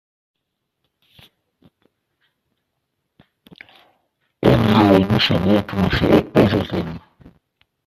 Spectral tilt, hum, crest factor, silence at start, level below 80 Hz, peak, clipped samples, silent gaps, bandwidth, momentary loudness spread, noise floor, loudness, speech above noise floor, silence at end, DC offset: -7.5 dB/octave; none; 20 dB; 4.4 s; -42 dBFS; 0 dBFS; under 0.1%; none; 14 kHz; 12 LU; -76 dBFS; -16 LUFS; 59 dB; 0.9 s; under 0.1%